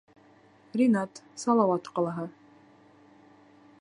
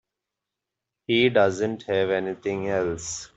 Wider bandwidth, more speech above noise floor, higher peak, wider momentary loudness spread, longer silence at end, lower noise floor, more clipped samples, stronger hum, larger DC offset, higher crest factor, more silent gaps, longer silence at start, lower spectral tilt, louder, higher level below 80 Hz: first, 11 kHz vs 8.2 kHz; second, 32 dB vs 62 dB; second, -10 dBFS vs -6 dBFS; first, 14 LU vs 9 LU; first, 1.5 s vs 0.1 s; second, -58 dBFS vs -86 dBFS; neither; neither; neither; about the same, 20 dB vs 20 dB; neither; second, 0.75 s vs 1.1 s; first, -6.5 dB/octave vs -4.5 dB/octave; second, -28 LUFS vs -24 LUFS; second, -78 dBFS vs -60 dBFS